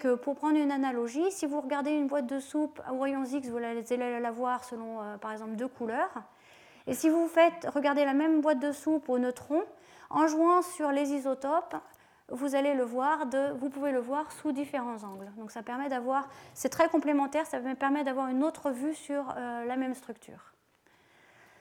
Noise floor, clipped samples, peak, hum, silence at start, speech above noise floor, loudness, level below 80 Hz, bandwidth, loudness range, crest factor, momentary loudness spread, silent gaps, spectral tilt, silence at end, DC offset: -66 dBFS; under 0.1%; -10 dBFS; none; 0 s; 36 dB; -31 LUFS; -76 dBFS; 17 kHz; 6 LU; 20 dB; 13 LU; none; -4 dB/octave; 1.2 s; under 0.1%